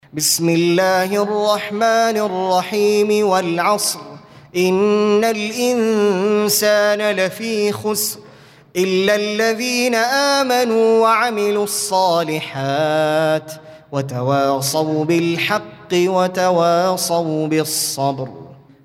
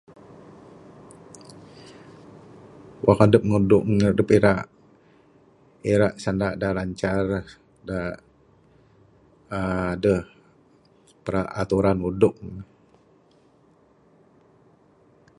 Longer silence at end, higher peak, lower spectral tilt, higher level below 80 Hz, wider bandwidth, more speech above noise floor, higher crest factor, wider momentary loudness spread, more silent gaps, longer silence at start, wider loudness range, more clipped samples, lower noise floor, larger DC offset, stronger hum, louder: second, 0.3 s vs 2.75 s; about the same, -2 dBFS vs 0 dBFS; second, -4 dB/octave vs -7.5 dB/octave; second, -64 dBFS vs -48 dBFS; first, 16.5 kHz vs 11.5 kHz; second, 28 dB vs 37 dB; second, 14 dB vs 24 dB; second, 7 LU vs 26 LU; neither; second, 0.15 s vs 1.35 s; second, 3 LU vs 9 LU; neither; second, -44 dBFS vs -58 dBFS; neither; neither; first, -17 LUFS vs -22 LUFS